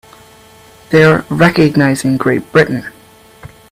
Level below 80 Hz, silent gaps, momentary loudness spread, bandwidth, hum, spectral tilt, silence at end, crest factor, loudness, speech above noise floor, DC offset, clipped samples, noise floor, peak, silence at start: -46 dBFS; none; 7 LU; 16 kHz; none; -6.5 dB/octave; 0.25 s; 14 dB; -11 LUFS; 30 dB; under 0.1%; under 0.1%; -41 dBFS; 0 dBFS; 0.9 s